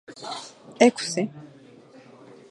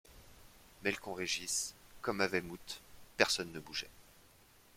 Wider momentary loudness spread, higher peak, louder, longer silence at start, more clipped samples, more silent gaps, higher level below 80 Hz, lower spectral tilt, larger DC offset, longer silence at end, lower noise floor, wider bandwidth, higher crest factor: first, 22 LU vs 16 LU; first, -2 dBFS vs -10 dBFS; first, -24 LUFS vs -37 LUFS; about the same, 0.1 s vs 0.05 s; neither; neither; second, -76 dBFS vs -66 dBFS; first, -4 dB/octave vs -2 dB/octave; neither; first, 1.05 s vs 0.55 s; second, -50 dBFS vs -64 dBFS; second, 11.5 kHz vs 16.5 kHz; about the same, 26 dB vs 30 dB